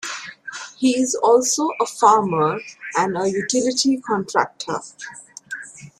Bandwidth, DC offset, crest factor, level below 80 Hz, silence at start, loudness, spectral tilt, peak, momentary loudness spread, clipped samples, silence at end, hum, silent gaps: 14.5 kHz; under 0.1%; 18 dB; -66 dBFS; 0 s; -19 LUFS; -3.5 dB/octave; -2 dBFS; 18 LU; under 0.1%; 0.1 s; none; none